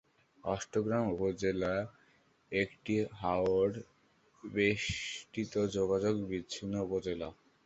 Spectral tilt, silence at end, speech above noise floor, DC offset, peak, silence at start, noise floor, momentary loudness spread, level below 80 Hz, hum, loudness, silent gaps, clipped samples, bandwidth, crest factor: -5.5 dB/octave; 0.35 s; 35 dB; under 0.1%; -16 dBFS; 0.45 s; -68 dBFS; 9 LU; -58 dBFS; none; -34 LUFS; none; under 0.1%; 8.2 kHz; 20 dB